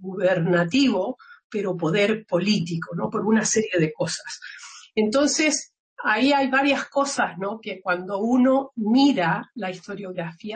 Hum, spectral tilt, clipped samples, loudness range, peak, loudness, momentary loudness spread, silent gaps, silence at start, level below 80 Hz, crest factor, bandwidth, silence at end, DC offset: none; -4.5 dB/octave; under 0.1%; 2 LU; -10 dBFS; -22 LUFS; 13 LU; 1.44-1.50 s, 5.79-5.97 s; 0 s; -66 dBFS; 14 dB; 8.8 kHz; 0 s; under 0.1%